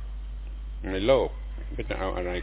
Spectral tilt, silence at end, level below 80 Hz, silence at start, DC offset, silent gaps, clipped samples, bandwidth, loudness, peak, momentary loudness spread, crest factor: -10 dB/octave; 0 s; -34 dBFS; 0 s; under 0.1%; none; under 0.1%; 4 kHz; -28 LUFS; -10 dBFS; 16 LU; 18 dB